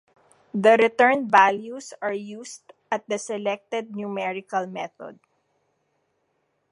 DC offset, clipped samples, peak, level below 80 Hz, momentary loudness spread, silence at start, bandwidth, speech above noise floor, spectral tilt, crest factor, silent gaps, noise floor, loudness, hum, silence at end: under 0.1%; under 0.1%; -2 dBFS; -80 dBFS; 20 LU; 0.55 s; 11.5 kHz; 49 dB; -4.5 dB/octave; 22 dB; none; -72 dBFS; -23 LUFS; none; 1.55 s